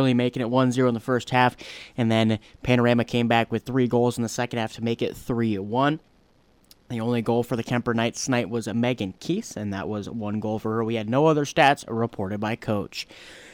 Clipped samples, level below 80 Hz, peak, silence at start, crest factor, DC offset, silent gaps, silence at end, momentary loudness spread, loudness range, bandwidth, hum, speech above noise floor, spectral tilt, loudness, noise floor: under 0.1%; -54 dBFS; -6 dBFS; 0 s; 18 dB; under 0.1%; none; 0 s; 10 LU; 4 LU; 16.5 kHz; none; 36 dB; -6 dB/octave; -24 LUFS; -59 dBFS